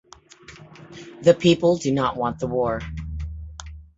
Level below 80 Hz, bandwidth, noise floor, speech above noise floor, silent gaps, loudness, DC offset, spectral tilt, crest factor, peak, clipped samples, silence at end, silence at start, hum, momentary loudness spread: -40 dBFS; 8 kHz; -47 dBFS; 27 dB; none; -22 LUFS; under 0.1%; -6 dB/octave; 22 dB; -2 dBFS; under 0.1%; 0.15 s; 0.5 s; none; 23 LU